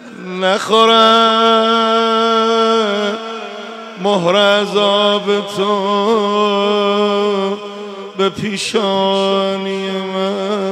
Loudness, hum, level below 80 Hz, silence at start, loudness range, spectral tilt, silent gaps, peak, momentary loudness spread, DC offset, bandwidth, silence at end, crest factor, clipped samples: -14 LUFS; none; -64 dBFS; 0 s; 5 LU; -4.5 dB/octave; none; 0 dBFS; 13 LU; under 0.1%; 13 kHz; 0 s; 14 dB; under 0.1%